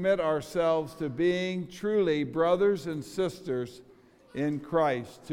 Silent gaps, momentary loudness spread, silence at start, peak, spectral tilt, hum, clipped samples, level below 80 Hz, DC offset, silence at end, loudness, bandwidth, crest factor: none; 9 LU; 0 s; -12 dBFS; -6.5 dB/octave; none; under 0.1%; -62 dBFS; under 0.1%; 0 s; -29 LUFS; 16 kHz; 16 dB